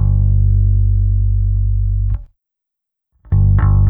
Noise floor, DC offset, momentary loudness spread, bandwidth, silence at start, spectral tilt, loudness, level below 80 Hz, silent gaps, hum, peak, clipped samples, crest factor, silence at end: -81 dBFS; under 0.1%; 7 LU; 2.1 kHz; 0 s; -13.5 dB/octave; -16 LUFS; -16 dBFS; none; none; -2 dBFS; under 0.1%; 10 dB; 0 s